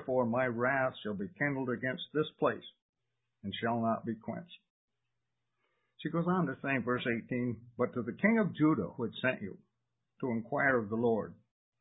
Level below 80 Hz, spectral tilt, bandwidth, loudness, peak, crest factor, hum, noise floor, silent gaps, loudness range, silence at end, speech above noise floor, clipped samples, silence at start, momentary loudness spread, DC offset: -68 dBFS; -3 dB/octave; 3.9 kHz; -33 LUFS; -14 dBFS; 20 dB; none; -87 dBFS; 2.82-2.93 s, 4.70-4.88 s; 6 LU; 0.45 s; 54 dB; under 0.1%; 0 s; 12 LU; under 0.1%